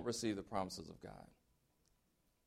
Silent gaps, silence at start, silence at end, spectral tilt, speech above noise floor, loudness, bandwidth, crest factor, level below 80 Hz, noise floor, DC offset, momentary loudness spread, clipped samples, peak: none; 0 s; 1.2 s; -4.5 dB/octave; 36 dB; -44 LUFS; 15.5 kHz; 22 dB; -70 dBFS; -80 dBFS; under 0.1%; 19 LU; under 0.1%; -26 dBFS